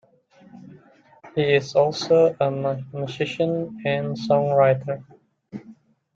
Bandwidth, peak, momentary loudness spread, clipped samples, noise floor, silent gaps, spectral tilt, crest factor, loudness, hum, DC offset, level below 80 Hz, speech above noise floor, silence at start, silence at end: 7.8 kHz; -6 dBFS; 15 LU; under 0.1%; -54 dBFS; none; -6.5 dB/octave; 18 dB; -22 LUFS; none; under 0.1%; -64 dBFS; 32 dB; 0.55 s; 0.45 s